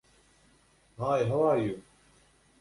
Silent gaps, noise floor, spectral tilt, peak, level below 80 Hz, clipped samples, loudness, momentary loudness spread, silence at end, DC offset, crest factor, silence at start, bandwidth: none; -64 dBFS; -7.5 dB/octave; -14 dBFS; -62 dBFS; under 0.1%; -29 LUFS; 10 LU; 0.8 s; under 0.1%; 16 dB; 1 s; 11.5 kHz